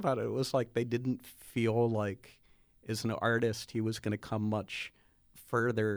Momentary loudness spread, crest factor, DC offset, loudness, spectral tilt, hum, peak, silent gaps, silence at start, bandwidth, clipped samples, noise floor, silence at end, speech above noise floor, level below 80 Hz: 10 LU; 18 dB; under 0.1%; -34 LUFS; -6 dB/octave; none; -16 dBFS; none; 0 s; over 20 kHz; under 0.1%; -60 dBFS; 0 s; 28 dB; -66 dBFS